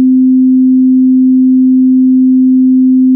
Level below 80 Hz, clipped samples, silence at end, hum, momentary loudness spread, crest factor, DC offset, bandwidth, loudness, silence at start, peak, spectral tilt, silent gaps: -70 dBFS; under 0.1%; 0 s; none; 0 LU; 4 dB; under 0.1%; 0.4 kHz; -7 LUFS; 0 s; -2 dBFS; -17.5 dB/octave; none